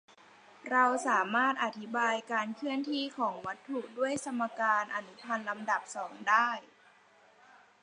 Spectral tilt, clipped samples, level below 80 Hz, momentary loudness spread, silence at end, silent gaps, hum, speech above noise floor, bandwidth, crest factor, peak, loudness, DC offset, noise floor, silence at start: -3 dB/octave; under 0.1%; -82 dBFS; 11 LU; 1.15 s; none; none; 30 dB; 10.5 kHz; 20 dB; -12 dBFS; -32 LUFS; under 0.1%; -62 dBFS; 0.65 s